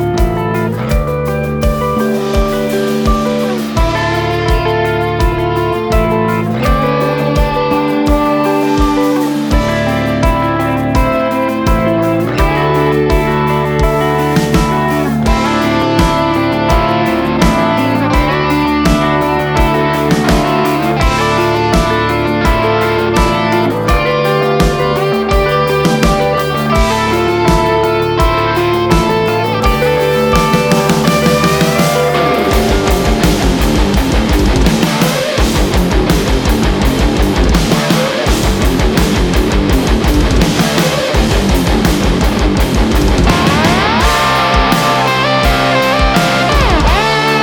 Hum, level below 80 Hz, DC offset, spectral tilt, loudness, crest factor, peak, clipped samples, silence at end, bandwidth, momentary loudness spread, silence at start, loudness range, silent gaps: none; -18 dBFS; under 0.1%; -5.5 dB/octave; -12 LUFS; 12 dB; 0 dBFS; under 0.1%; 0 s; over 20 kHz; 3 LU; 0 s; 2 LU; none